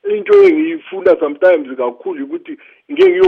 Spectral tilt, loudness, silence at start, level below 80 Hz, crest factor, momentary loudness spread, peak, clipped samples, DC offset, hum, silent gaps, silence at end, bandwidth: -6 dB/octave; -13 LUFS; 0.05 s; -60 dBFS; 12 dB; 17 LU; -2 dBFS; under 0.1%; under 0.1%; none; none; 0 s; 5.2 kHz